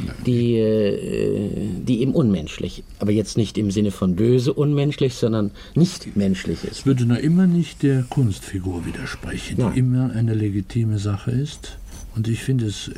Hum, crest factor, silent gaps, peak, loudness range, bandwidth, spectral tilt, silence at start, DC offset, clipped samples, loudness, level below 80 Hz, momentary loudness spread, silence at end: none; 14 dB; none; -6 dBFS; 3 LU; 14.5 kHz; -7 dB/octave; 0 s; under 0.1%; under 0.1%; -21 LUFS; -42 dBFS; 10 LU; 0 s